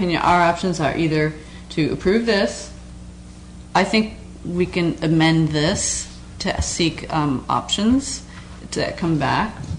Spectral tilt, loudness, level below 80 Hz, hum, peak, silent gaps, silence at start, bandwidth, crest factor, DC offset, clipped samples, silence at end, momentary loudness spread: -4.5 dB/octave; -20 LUFS; -38 dBFS; none; -6 dBFS; none; 0 s; 10.5 kHz; 14 dB; under 0.1%; under 0.1%; 0 s; 20 LU